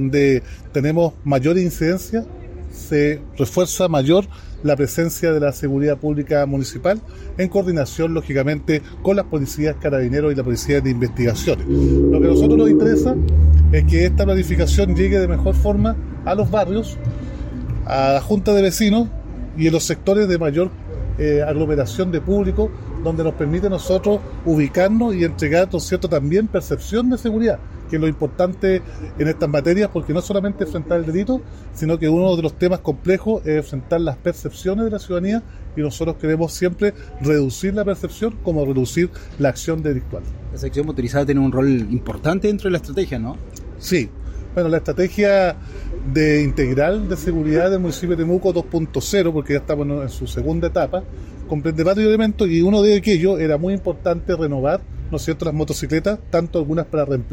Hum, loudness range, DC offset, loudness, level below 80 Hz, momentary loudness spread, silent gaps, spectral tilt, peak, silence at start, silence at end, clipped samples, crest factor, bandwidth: none; 5 LU; under 0.1%; -19 LUFS; -28 dBFS; 10 LU; none; -6.5 dB/octave; -2 dBFS; 0 s; 0 s; under 0.1%; 16 dB; 16.5 kHz